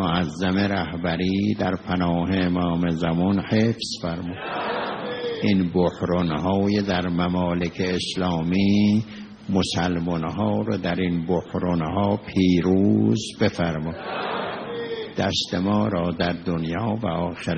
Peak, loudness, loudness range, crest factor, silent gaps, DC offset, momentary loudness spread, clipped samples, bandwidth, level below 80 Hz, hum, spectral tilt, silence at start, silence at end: -6 dBFS; -23 LUFS; 3 LU; 16 dB; none; under 0.1%; 8 LU; under 0.1%; 8.4 kHz; -50 dBFS; none; -6.5 dB/octave; 0 s; 0 s